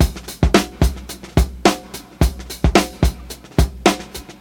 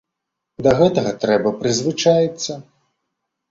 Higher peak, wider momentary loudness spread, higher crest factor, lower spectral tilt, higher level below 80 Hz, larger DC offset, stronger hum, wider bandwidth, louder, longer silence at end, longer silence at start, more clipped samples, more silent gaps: about the same, 0 dBFS vs -2 dBFS; about the same, 12 LU vs 11 LU; about the same, 18 dB vs 16 dB; about the same, -5 dB/octave vs -5 dB/octave; first, -22 dBFS vs -52 dBFS; neither; neither; first, 19.5 kHz vs 7.8 kHz; about the same, -19 LUFS vs -18 LUFS; second, 0.1 s vs 0.9 s; second, 0 s vs 0.6 s; neither; neither